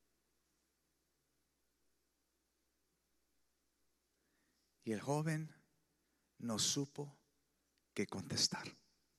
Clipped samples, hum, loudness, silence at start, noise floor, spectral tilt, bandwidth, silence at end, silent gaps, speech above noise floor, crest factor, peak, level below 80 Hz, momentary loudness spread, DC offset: under 0.1%; none; -40 LUFS; 4.85 s; -84 dBFS; -3.5 dB/octave; 14.5 kHz; 0.45 s; none; 44 dB; 26 dB; -22 dBFS; -88 dBFS; 16 LU; under 0.1%